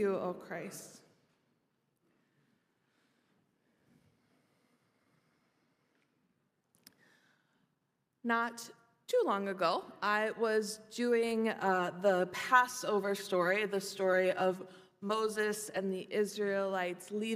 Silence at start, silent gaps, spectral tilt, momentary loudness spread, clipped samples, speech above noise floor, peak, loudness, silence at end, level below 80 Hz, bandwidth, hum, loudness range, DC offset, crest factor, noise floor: 0 s; none; -4 dB/octave; 13 LU; under 0.1%; 48 dB; -12 dBFS; -33 LUFS; 0 s; -88 dBFS; 15.5 kHz; none; 11 LU; under 0.1%; 24 dB; -82 dBFS